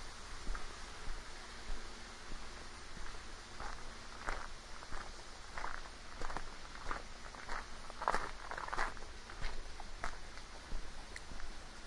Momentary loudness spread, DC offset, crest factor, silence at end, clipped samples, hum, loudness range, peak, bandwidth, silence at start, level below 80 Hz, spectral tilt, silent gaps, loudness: 10 LU; under 0.1%; 26 dB; 0 s; under 0.1%; none; 6 LU; -16 dBFS; 11.5 kHz; 0 s; -48 dBFS; -3 dB/octave; none; -47 LUFS